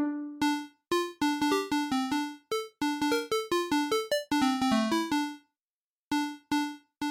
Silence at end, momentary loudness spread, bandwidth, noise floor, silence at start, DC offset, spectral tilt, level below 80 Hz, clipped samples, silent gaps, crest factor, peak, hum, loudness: 0 s; 8 LU; 17 kHz; under -90 dBFS; 0 s; under 0.1%; -3.5 dB/octave; -64 dBFS; under 0.1%; 5.61-6.11 s; 14 dB; -16 dBFS; none; -30 LUFS